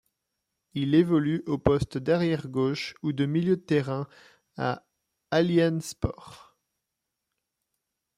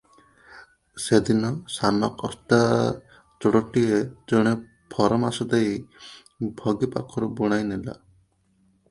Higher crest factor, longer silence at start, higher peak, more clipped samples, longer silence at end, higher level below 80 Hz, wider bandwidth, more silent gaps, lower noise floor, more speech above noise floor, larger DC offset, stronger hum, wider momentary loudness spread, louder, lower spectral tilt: about the same, 22 dB vs 20 dB; first, 0.75 s vs 0.55 s; about the same, -6 dBFS vs -4 dBFS; neither; first, 1.8 s vs 0.95 s; about the same, -52 dBFS vs -54 dBFS; first, 14.5 kHz vs 11.5 kHz; neither; first, -84 dBFS vs -64 dBFS; first, 58 dB vs 41 dB; neither; neither; second, 11 LU vs 14 LU; second, -27 LUFS vs -24 LUFS; about the same, -7 dB/octave vs -6 dB/octave